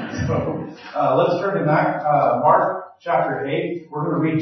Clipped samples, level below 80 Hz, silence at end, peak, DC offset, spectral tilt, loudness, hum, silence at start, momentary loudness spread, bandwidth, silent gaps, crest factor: under 0.1%; -54 dBFS; 0 s; -4 dBFS; under 0.1%; -8 dB/octave; -20 LUFS; none; 0 s; 11 LU; 6.4 kHz; none; 16 dB